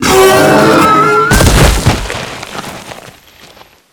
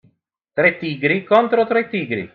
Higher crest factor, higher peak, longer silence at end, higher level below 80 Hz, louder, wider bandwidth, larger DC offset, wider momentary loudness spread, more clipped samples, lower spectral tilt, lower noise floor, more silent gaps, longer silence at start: second, 10 dB vs 18 dB; about the same, 0 dBFS vs -2 dBFS; first, 0.8 s vs 0.05 s; first, -20 dBFS vs -64 dBFS; first, -7 LUFS vs -18 LUFS; first, over 20 kHz vs 5.4 kHz; neither; first, 18 LU vs 8 LU; first, 1% vs under 0.1%; second, -4.5 dB/octave vs -8 dB/octave; second, -39 dBFS vs -64 dBFS; neither; second, 0 s vs 0.55 s